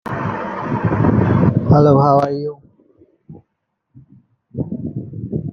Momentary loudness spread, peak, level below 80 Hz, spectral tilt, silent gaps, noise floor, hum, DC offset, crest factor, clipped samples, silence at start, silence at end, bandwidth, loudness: 16 LU; -2 dBFS; -44 dBFS; -10 dB/octave; none; -73 dBFS; none; under 0.1%; 16 dB; under 0.1%; 0.05 s; 0 s; 6.4 kHz; -16 LUFS